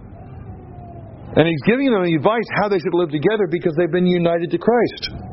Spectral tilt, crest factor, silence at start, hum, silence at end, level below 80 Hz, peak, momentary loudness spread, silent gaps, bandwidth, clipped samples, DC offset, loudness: -5.5 dB/octave; 18 dB; 0 s; none; 0 s; -46 dBFS; 0 dBFS; 20 LU; none; 6 kHz; under 0.1%; under 0.1%; -18 LUFS